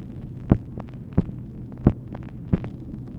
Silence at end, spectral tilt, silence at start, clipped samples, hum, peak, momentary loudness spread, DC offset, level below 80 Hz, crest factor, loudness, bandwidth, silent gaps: 0 s; -11.5 dB/octave; 0 s; under 0.1%; none; -2 dBFS; 13 LU; under 0.1%; -36 dBFS; 26 dB; -27 LUFS; 4.3 kHz; none